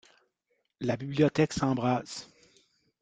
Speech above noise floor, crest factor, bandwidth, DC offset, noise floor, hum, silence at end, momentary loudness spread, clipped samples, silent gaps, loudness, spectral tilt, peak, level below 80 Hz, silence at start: 50 dB; 20 dB; 9.4 kHz; under 0.1%; -78 dBFS; none; 0.75 s; 13 LU; under 0.1%; none; -29 LUFS; -6 dB/octave; -10 dBFS; -60 dBFS; 0.8 s